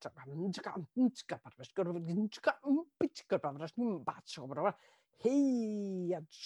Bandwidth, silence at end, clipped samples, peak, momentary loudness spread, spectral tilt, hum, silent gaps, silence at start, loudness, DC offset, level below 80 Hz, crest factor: 11 kHz; 0 s; under 0.1%; -16 dBFS; 11 LU; -6.5 dB/octave; none; none; 0 s; -37 LUFS; under 0.1%; -82 dBFS; 20 dB